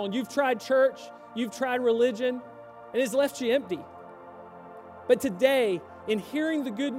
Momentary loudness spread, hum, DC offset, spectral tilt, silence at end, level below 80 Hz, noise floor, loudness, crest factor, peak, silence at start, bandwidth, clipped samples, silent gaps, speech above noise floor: 22 LU; none; under 0.1%; -4.5 dB/octave; 0 s; -72 dBFS; -46 dBFS; -27 LUFS; 18 dB; -8 dBFS; 0 s; 16 kHz; under 0.1%; none; 19 dB